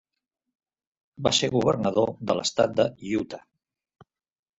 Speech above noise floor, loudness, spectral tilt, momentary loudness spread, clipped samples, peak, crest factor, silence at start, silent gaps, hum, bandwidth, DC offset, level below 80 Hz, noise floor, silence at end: 60 dB; -25 LUFS; -4.5 dB/octave; 8 LU; under 0.1%; -6 dBFS; 22 dB; 1.2 s; none; none; 8.2 kHz; under 0.1%; -58 dBFS; -84 dBFS; 1.2 s